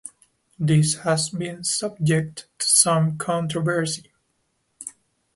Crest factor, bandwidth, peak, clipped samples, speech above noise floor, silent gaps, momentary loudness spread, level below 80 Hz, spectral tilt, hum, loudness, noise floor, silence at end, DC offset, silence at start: 22 dB; 12 kHz; -2 dBFS; under 0.1%; 48 dB; none; 21 LU; -62 dBFS; -4 dB/octave; none; -21 LUFS; -71 dBFS; 0.45 s; under 0.1%; 0.05 s